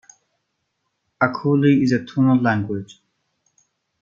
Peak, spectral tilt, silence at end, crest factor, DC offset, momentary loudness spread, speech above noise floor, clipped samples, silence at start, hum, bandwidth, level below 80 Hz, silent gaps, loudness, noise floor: -2 dBFS; -8 dB/octave; 1.2 s; 20 dB; under 0.1%; 8 LU; 56 dB; under 0.1%; 1.2 s; none; 7.2 kHz; -62 dBFS; none; -19 LUFS; -74 dBFS